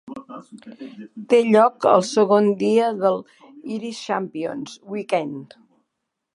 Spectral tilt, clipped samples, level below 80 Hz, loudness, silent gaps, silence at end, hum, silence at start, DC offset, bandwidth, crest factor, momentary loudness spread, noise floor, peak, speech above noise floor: -5.5 dB/octave; under 0.1%; -72 dBFS; -20 LUFS; none; 0.9 s; none; 0.05 s; under 0.1%; 11.5 kHz; 20 dB; 23 LU; -79 dBFS; -2 dBFS; 59 dB